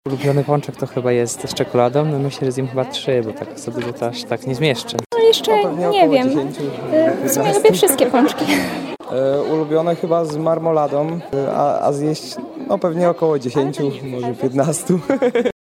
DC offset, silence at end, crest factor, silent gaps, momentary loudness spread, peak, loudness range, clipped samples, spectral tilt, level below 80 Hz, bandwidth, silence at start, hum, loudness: under 0.1%; 0.1 s; 18 dB; 5.06-5.10 s; 11 LU; 0 dBFS; 4 LU; under 0.1%; -5 dB/octave; -58 dBFS; 16.5 kHz; 0.05 s; none; -18 LUFS